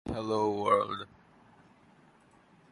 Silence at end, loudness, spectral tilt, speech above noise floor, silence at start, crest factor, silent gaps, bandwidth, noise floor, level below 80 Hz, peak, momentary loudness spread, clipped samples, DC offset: 1.65 s; -30 LUFS; -6 dB/octave; 32 dB; 0.05 s; 22 dB; none; 11.5 kHz; -62 dBFS; -58 dBFS; -12 dBFS; 14 LU; under 0.1%; under 0.1%